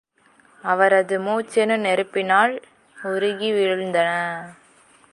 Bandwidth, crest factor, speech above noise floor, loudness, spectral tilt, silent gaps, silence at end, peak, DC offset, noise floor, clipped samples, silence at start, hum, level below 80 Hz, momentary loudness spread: 11.5 kHz; 18 dB; 36 dB; -20 LUFS; -4.5 dB/octave; none; 0.6 s; -4 dBFS; under 0.1%; -56 dBFS; under 0.1%; 0.65 s; none; -74 dBFS; 15 LU